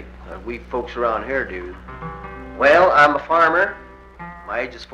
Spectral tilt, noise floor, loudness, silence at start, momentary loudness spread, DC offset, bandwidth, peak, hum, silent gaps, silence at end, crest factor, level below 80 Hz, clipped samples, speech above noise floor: -5.5 dB/octave; -38 dBFS; -17 LUFS; 0 s; 22 LU; under 0.1%; 9.6 kHz; -2 dBFS; none; none; 0 s; 18 dB; -42 dBFS; under 0.1%; 19 dB